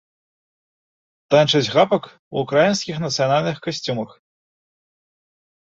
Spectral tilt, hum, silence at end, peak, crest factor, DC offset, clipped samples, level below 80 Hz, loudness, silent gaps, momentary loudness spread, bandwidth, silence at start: -4.5 dB/octave; none; 1.6 s; -2 dBFS; 20 dB; under 0.1%; under 0.1%; -62 dBFS; -19 LUFS; 2.19-2.31 s; 11 LU; 7.8 kHz; 1.3 s